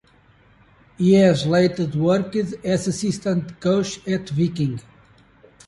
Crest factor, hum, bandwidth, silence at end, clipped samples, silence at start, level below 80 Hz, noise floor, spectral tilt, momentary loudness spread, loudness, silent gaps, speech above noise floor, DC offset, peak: 16 dB; none; 11.5 kHz; 0.85 s; under 0.1%; 1 s; -54 dBFS; -55 dBFS; -6.5 dB/octave; 10 LU; -20 LUFS; none; 35 dB; under 0.1%; -4 dBFS